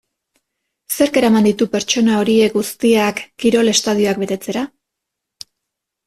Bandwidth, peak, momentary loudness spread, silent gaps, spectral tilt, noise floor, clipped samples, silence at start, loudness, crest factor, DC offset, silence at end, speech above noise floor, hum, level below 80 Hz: 15 kHz; -2 dBFS; 9 LU; none; -4 dB/octave; -80 dBFS; under 0.1%; 0.9 s; -16 LUFS; 16 dB; under 0.1%; 1.4 s; 65 dB; none; -56 dBFS